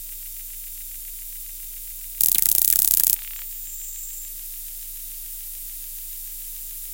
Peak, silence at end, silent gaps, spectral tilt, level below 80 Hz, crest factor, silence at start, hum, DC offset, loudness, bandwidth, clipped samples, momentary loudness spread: 0 dBFS; 0 s; none; 1.5 dB/octave; -44 dBFS; 26 dB; 0 s; none; under 0.1%; -23 LUFS; 18 kHz; under 0.1%; 17 LU